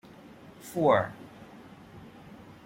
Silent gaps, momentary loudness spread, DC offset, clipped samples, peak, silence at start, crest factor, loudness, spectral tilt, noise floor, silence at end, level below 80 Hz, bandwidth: none; 26 LU; under 0.1%; under 0.1%; -10 dBFS; 0.65 s; 22 dB; -27 LUFS; -6 dB/octave; -50 dBFS; 0.65 s; -64 dBFS; 16.5 kHz